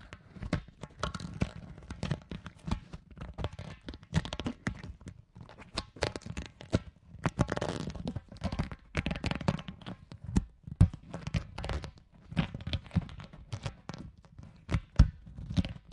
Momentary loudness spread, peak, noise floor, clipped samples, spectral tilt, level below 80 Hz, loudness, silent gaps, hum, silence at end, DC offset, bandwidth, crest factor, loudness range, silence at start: 17 LU; -8 dBFS; -53 dBFS; under 0.1%; -6.5 dB/octave; -42 dBFS; -36 LUFS; none; none; 0 s; under 0.1%; 11.5 kHz; 28 dB; 6 LU; 0 s